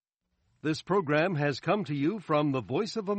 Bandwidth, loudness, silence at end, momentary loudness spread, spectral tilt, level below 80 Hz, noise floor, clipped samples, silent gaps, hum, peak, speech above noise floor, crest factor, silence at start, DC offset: 8.4 kHz; -29 LUFS; 0 s; 6 LU; -6.5 dB/octave; -70 dBFS; -77 dBFS; under 0.1%; none; none; -12 dBFS; 49 dB; 16 dB; 0.65 s; under 0.1%